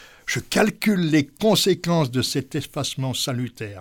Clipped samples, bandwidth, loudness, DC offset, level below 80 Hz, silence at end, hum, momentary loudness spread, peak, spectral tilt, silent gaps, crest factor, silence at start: under 0.1%; 19 kHz; -22 LUFS; under 0.1%; -54 dBFS; 0 s; none; 9 LU; -6 dBFS; -4.5 dB/octave; none; 18 dB; 0 s